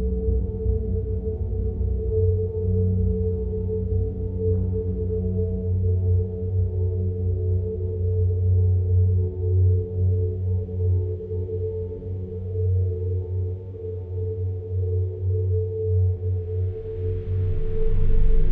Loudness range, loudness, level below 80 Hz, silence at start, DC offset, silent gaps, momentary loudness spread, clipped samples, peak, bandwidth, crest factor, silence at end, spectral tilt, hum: 4 LU; -25 LUFS; -28 dBFS; 0 s; under 0.1%; none; 8 LU; under 0.1%; -8 dBFS; 1.1 kHz; 14 dB; 0 s; -13.5 dB/octave; none